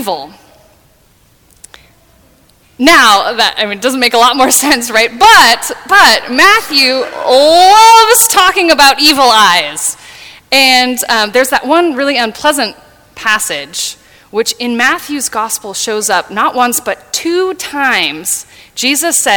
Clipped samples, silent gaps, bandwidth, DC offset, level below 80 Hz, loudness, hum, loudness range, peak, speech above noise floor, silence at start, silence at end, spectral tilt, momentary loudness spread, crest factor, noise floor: 1%; none; over 20 kHz; under 0.1%; -44 dBFS; -8 LUFS; none; 8 LU; 0 dBFS; 39 dB; 0 s; 0 s; -0.5 dB/octave; 12 LU; 10 dB; -48 dBFS